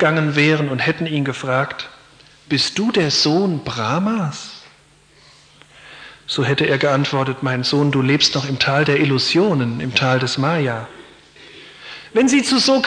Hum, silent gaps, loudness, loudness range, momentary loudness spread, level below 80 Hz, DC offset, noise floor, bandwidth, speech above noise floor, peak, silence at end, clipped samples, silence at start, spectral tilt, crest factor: none; none; -17 LUFS; 5 LU; 16 LU; -56 dBFS; under 0.1%; -51 dBFS; 10.5 kHz; 34 dB; -2 dBFS; 0 s; under 0.1%; 0 s; -5 dB/octave; 16 dB